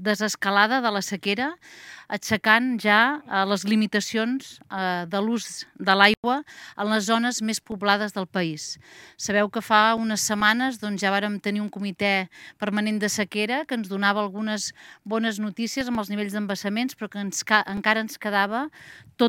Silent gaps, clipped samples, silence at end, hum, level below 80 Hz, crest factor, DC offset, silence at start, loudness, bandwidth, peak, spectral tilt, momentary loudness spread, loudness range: 6.17-6.23 s; under 0.1%; 0 s; none; -64 dBFS; 24 dB; under 0.1%; 0 s; -24 LUFS; 17 kHz; 0 dBFS; -3.5 dB/octave; 12 LU; 4 LU